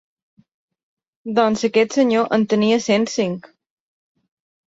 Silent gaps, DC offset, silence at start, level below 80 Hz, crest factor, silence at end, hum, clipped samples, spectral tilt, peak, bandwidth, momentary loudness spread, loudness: none; under 0.1%; 1.25 s; -62 dBFS; 16 dB; 1.2 s; none; under 0.1%; -5 dB/octave; -4 dBFS; 8 kHz; 7 LU; -18 LUFS